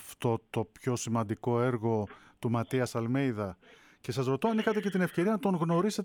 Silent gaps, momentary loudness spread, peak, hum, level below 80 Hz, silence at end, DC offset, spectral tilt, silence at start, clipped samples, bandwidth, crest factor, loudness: none; 9 LU; -16 dBFS; none; -68 dBFS; 0 s; under 0.1%; -6.5 dB/octave; 0 s; under 0.1%; 19.5 kHz; 16 dB; -31 LUFS